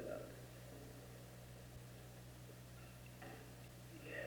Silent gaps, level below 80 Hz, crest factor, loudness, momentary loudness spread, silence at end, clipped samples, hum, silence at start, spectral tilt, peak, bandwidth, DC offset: none; -66 dBFS; 18 dB; -56 LUFS; 6 LU; 0 s; under 0.1%; none; 0 s; -5 dB/octave; -36 dBFS; over 20 kHz; under 0.1%